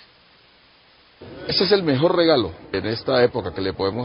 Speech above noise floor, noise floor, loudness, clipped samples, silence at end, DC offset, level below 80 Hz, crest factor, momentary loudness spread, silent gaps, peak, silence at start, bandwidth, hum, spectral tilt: 34 dB; -54 dBFS; -20 LUFS; under 0.1%; 0 s; under 0.1%; -48 dBFS; 18 dB; 10 LU; none; -4 dBFS; 1.2 s; 5.6 kHz; none; -9.5 dB/octave